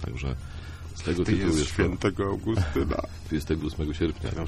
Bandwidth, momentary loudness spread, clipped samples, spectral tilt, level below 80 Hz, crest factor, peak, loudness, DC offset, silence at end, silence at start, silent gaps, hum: 13.5 kHz; 10 LU; under 0.1%; -6 dB/octave; -36 dBFS; 18 dB; -10 dBFS; -28 LUFS; under 0.1%; 0 s; 0 s; none; none